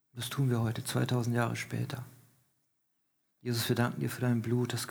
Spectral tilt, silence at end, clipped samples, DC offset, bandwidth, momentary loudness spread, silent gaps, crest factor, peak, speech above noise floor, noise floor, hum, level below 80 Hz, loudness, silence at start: -5.5 dB/octave; 0 s; under 0.1%; under 0.1%; over 20 kHz; 8 LU; none; 18 dB; -16 dBFS; 46 dB; -78 dBFS; none; -68 dBFS; -32 LUFS; 0.15 s